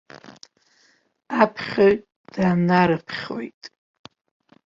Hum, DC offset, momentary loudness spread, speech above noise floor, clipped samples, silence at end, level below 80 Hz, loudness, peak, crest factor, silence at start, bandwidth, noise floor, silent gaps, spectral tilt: none; under 0.1%; 16 LU; 41 dB; under 0.1%; 1 s; -58 dBFS; -21 LUFS; -2 dBFS; 22 dB; 0.3 s; 7.4 kHz; -62 dBFS; 2.16-2.24 s, 3.54-3.61 s; -7.5 dB/octave